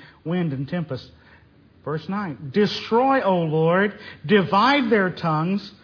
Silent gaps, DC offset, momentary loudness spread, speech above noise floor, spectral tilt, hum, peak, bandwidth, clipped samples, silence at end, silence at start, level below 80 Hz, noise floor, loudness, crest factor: none; under 0.1%; 13 LU; 31 dB; -7.5 dB/octave; none; -4 dBFS; 5.4 kHz; under 0.1%; 0.15 s; 0 s; -60 dBFS; -53 dBFS; -21 LUFS; 18 dB